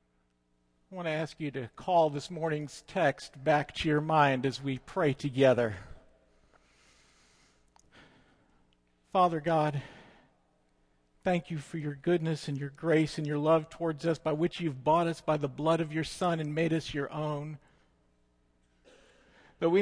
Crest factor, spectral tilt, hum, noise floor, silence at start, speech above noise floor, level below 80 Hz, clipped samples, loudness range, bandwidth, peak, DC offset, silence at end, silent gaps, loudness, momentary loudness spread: 20 dB; -6.5 dB/octave; 60 Hz at -65 dBFS; -73 dBFS; 0.9 s; 43 dB; -62 dBFS; under 0.1%; 6 LU; 10.5 kHz; -12 dBFS; under 0.1%; 0 s; none; -30 LUFS; 11 LU